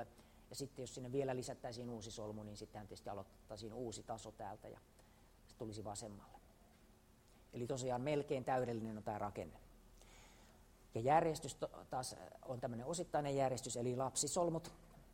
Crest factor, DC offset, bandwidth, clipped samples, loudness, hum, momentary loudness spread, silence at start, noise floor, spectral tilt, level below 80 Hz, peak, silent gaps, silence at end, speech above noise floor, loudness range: 24 dB; under 0.1%; 16 kHz; under 0.1%; -43 LUFS; none; 17 LU; 0 s; -68 dBFS; -4.5 dB/octave; -68 dBFS; -20 dBFS; none; 0 s; 25 dB; 11 LU